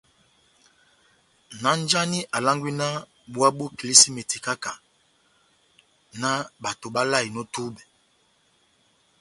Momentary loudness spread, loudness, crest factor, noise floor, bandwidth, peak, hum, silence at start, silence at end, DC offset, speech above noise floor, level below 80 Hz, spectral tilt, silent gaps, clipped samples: 19 LU; -22 LUFS; 26 dB; -65 dBFS; 16 kHz; 0 dBFS; none; 1.5 s; 1.4 s; under 0.1%; 41 dB; -68 dBFS; -2 dB/octave; none; under 0.1%